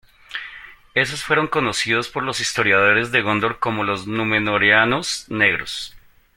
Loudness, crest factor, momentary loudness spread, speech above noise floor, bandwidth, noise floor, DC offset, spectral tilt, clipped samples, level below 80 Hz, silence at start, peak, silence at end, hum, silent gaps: -18 LUFS; 20 dB; 16 LU; 22 dB; 16.5 kHz; -41 dBFS; under 0.1%; -3.5 dB/octave; under 0.1%; -52 dBFS; 0.3 s; -2 dBFS; 0.4 s; none; none